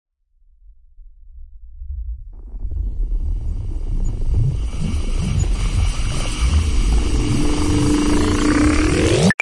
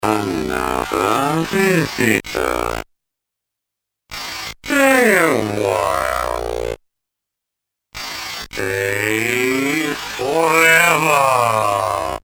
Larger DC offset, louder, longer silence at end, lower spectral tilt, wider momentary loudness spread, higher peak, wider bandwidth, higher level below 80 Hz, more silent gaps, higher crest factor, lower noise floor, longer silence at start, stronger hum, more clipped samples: neither; second, -20 LUFS vs -17 LUFS; about the same, 0.1 s vs 0.05 s; first, -5.5 dB/octave vs -4 dB/octave; about the same, 16 LU vs 15 LU; about the same, -2 dBFS vs 0 dBFS; second, 11.5 kHz vs over 20 kHz; first, -22 dBFS vs -42 dBFS; neither; about the same, 16 dB vs 18 dB; second, -54 dBFS vs -82 dBFS; first, 1 s vs 0 s; neither; neither